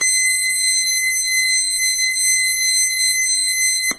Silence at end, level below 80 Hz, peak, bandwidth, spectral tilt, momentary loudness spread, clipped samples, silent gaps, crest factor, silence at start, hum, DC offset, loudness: 0 s; -58 dBFS; -6 dBFS; 11 kHz; 5 dB/octave; 1 LU; under 0.1%; none; 12 dB; 0 s; none; under 0.1%; -14 LUFS